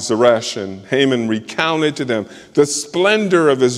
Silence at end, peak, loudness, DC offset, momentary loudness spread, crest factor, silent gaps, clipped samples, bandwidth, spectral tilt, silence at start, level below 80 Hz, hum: 0 s; 0 dBFS; -16 LUFS; under 0.1%; 8 LU; 16 dB; none; under 0.1%; 13 kHz; -4 dB/octave; 0 s; -60 dBFS; none